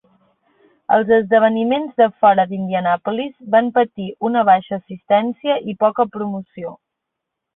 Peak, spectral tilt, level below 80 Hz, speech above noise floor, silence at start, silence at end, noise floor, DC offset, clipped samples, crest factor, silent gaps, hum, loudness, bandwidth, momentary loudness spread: -2 dBFS; -11 dB/octave; -64 dBFS; 63 dB; 0.9 s; 0.8 s; -80 dBFS; under 0.1%; under 0.1%; 16 dB; none; none; -17 LUFS; 4 kHz; 14 LU